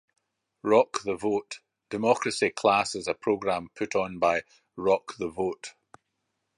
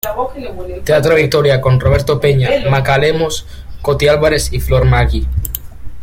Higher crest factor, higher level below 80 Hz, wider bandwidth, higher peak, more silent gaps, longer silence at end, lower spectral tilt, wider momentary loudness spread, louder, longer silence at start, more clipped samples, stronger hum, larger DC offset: first, 22 dB vs 12 dB; second, -64 dBFS vs -24 dBFS; second, 11 kHz vs 16.5 kHz; second, -6 dBFS vs 0 dBFS; neither; first, 0.9 s vs 0 s; second, -4 dB/octave vs -5.5 dB/octave; about the same, 14 LU vs 12 LU; second, -27 LUFS vs -13 LUFS; first, 0.65 s vs 0.05 s; neither; neither; neither